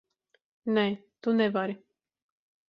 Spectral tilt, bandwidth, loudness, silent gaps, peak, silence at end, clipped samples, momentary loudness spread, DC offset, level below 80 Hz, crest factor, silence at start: -8 dB/octave; 5.4 kHz; -29 LUFS; none; -12 dBFS; 0.9 s; under 0.1%; 11 LU; under 0.1%; -78 dBFS; 20 dB; 0.65 s